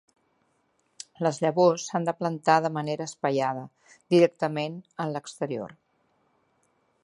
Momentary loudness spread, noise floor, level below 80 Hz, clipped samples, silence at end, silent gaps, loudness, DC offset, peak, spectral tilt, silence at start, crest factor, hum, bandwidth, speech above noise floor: 14 LU; -71 dBFS; -76 dBFS; under 0.1%; 1.3 s; none; -26 LUFS; under 0.1%; -6 dBFS; -5.5 dB/octave; 1.2 s; 22 dB; none; 11.5 kHz; 45 dB